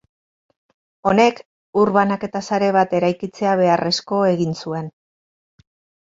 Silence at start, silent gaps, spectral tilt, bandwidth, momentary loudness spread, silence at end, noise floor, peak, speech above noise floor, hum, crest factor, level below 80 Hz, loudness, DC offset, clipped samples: 1.05 s; 1.46-1.73 s; -5.5 dB/octave; 7.8 kHz; 10 LU; 1.15 s; under -90 dBFS; -2 dBFS; over 72 dB; none; 18 dB; -58 dBFS; -19 LUFS; under 0.1%; under 0.1%